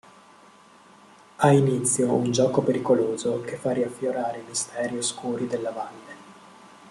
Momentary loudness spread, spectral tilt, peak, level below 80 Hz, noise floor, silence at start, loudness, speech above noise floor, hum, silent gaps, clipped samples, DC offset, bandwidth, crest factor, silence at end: 12 LU; -5 dB/octave; -4 dBFS; -66 dBFS; -52 dBFS; 1.4 s; -24 LUFS; 28 dB; none; none; under 0.1%; under 0.1%; 13 kHz; 22 dB; 0 s